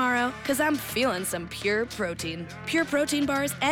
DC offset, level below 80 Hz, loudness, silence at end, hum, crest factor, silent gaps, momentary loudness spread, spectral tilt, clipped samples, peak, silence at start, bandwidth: under 0.1%; -56 dBFS; -27 LUFS; 0 s; none; 12 dB; none; 6 LU; -3.5 dB/octave; under 0.1%; -14 dBFS; 0 s; over 20 kHz